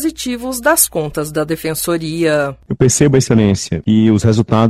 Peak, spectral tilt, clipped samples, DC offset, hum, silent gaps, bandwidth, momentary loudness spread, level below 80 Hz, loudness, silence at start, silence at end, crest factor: 0 dBFS; -5 dB/octave; under 0.1%; under 0.1%; none; none; 16 kHz; 8 LU; -40 dBFS; -14 LUFS; 0 s; 0 s; 14 dB